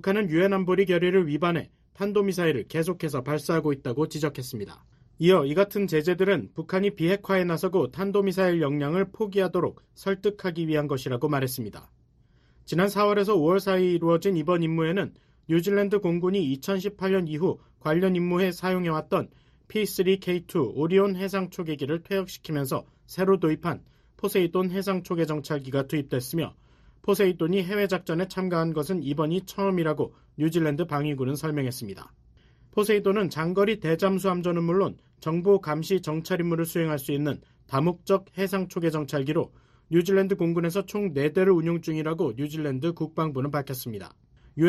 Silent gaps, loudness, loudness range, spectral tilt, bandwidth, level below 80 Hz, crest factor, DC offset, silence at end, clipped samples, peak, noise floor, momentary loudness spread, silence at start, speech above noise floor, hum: none; -26 LUFS; 3 LU; -6.5 dB/octave; 13.5 kHz; -60 dBFS; 18 dB; under 0.1%; 0 s; under 0.1%; -8 dBFS; -61 dBFS; 8 LU; 0.05 s; 35 dB; none